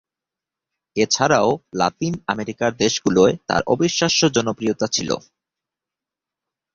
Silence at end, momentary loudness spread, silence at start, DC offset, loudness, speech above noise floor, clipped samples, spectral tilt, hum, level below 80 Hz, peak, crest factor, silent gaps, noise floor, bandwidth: 1.55 s; 9 LU; 0.95 s; under 0.1%; -19 LUFS; 68 dB; under 0.1%; -4 dB/octave; none; -54 dBFS; -2 dBFS; 20 dB; none; -87 dBFS; 7.6 kHz